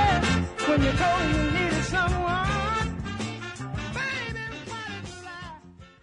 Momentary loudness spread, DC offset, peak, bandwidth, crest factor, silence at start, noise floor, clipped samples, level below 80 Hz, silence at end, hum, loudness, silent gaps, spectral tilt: 15 LU; under 0.1%; -10 dBFS; 11 kHz; 16 dB; 0 s; -47 dBFS; under 0.1%; -38 dBFS; 0.15 s; none; -26 LUFS; none; -5 dB/octave